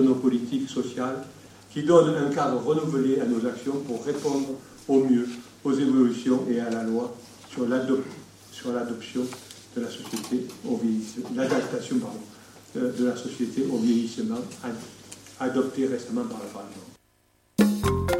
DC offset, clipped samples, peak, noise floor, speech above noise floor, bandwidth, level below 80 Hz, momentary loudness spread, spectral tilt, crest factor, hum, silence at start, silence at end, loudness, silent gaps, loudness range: under 0.1%; under 0.1%; -6 dBFS; -65 dBFS; 39 dB; 16 kHz; -54 dBFS; 16 LU; -6 dB/octave; 20 dB; none; 0 s; 0 s; -26 LUFS; none; 6 LU